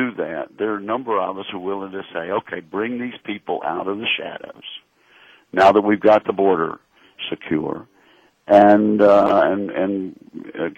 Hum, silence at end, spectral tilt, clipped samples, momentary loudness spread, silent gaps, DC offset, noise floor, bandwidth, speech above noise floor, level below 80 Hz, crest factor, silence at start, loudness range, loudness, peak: none; 0.05 s; -7 dB/octave; under 0.1%; 19 LU; none; under 0.1%; -55 dBFS; 8 kHz; 36 dB; -60 dBFS; 18 dB; 0 s; 8 LU; -19 LUFS; -2 dBFS